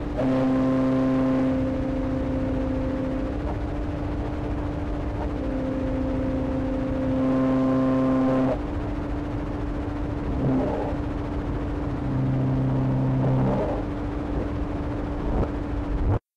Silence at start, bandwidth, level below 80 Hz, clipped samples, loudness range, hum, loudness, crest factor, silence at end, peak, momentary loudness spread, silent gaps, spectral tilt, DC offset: 0 s; 7.4 kHz; -32 dBFS; under 0.1%; 4 LU; none; -26 LUFS; 8 dB; 0.15 s; -16 dBFS; 8 LU; none; -9.5 dB/octave; under 0.1%